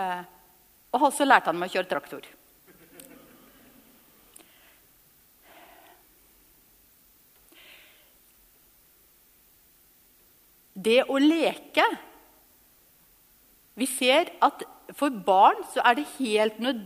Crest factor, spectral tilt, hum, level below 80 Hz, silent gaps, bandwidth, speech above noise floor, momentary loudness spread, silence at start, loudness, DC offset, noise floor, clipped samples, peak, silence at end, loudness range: 26 dB; -3 dB/octave; none; -72 dBFS; none; 15.5 kHz; 36 dB; 16 LU; 0 s; -24 LUFS; under 0.1%; -60 dBFS; under 0.1%; -2 dBFS; 0 s; 8 LU